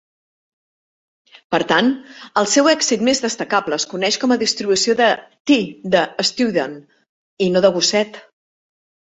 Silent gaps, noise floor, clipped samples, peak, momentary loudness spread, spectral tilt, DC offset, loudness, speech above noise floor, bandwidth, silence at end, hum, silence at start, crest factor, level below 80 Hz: 5.40-5.45 s, 7.09-7.37 s; under -90 dBFS; under 0.1%; -2 dBFS; 8 LU; -3 dB/octave; under 0.1%; -17 LUFS; over 73 dB; 8.4 kHz; 1 s; none; 1.5 s; 18 dB; -62 dBFS